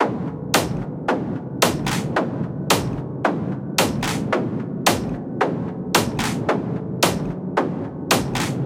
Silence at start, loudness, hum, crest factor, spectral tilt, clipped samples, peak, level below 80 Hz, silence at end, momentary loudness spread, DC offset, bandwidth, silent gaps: 0 s; -22 LUFS; none; 22 dB; -4.5 dB/octave; under 0.1%; 0 dBFS; -46 dBFS; 0 s; 6 LU; under 0.1%; 17 kHz; none